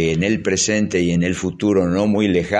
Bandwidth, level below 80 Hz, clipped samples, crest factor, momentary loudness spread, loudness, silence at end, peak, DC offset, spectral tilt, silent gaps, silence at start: 10 kHz; -44 dBFS; under 0.1%; 14 dB; 2 LU; -18 LUFS; 0 s; -4 dBFS; under 0.1%; -5 dB/octave; none; 0 s